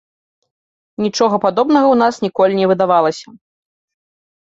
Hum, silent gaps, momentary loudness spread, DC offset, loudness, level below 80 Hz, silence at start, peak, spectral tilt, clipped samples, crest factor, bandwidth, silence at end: none; none; 9 LU; under 0.1%; -14 LUFS; -60 dBFS; 1 s; -2 dBFS; -5.5 dB/octave; under 0.1%; 14 dB; 8 kHz; 1.05 s